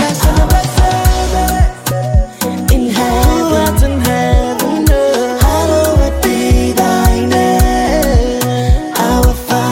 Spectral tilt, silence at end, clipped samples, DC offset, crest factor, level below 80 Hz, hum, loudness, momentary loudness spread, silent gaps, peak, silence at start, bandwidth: -5.5 dB/octave; 0 s; under 0.1%; under 0.1%; 10 dB; -16 dBFS; none; -12 LUFS; 3 LU; none; 0 dBFS; 0 s; 17 kHz